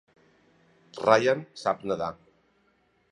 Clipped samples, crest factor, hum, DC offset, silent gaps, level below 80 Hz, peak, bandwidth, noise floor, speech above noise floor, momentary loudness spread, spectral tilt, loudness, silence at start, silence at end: under 0.1%; 24 dB; none; under 0.1%; none; -66 dBFS; -4 dBFS; 11 kHz; -68 dBFS; 42 dB; 12 LU; -5 dB/octave; -26 LUFS; 0.95 s; 1 s